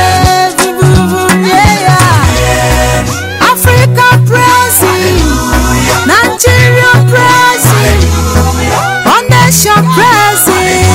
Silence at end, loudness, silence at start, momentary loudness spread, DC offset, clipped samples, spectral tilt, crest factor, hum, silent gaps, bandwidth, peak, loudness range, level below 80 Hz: 0 s; -6 LUFS; 0 s; 5 LU; under 0.1%; 3%; -4 dB/octave; 6 dB; none; none; 16.5 kHz; 0 dBFS; 1 LU; -18 dBFS